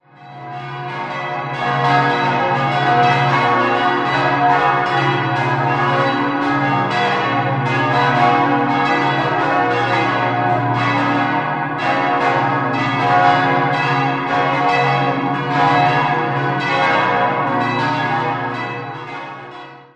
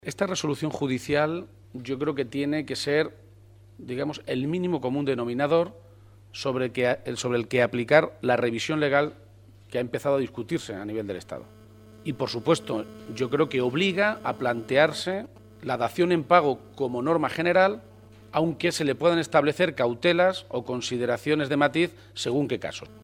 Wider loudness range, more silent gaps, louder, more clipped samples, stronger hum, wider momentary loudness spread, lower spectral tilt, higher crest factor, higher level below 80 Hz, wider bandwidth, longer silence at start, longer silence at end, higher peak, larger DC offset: second, 2 LU vs 5 LU; neither; first, -16 LUFS vs -26 LUFS; neither; neither; about the same, 9 LU vs 11 LU; about the same, -6.5 dB/octave vs -5.5 dB/octave; second, 16 dB vs 22 dB; first, -54 dBFS vs -62 dBFS; second, 9.2 kHz vs 16 kHz; first, 0.2 s vs 0.05 s; about the same, 0.1 s vs 0.05 s; first, 0 dBFS vs -4 dBFS; neither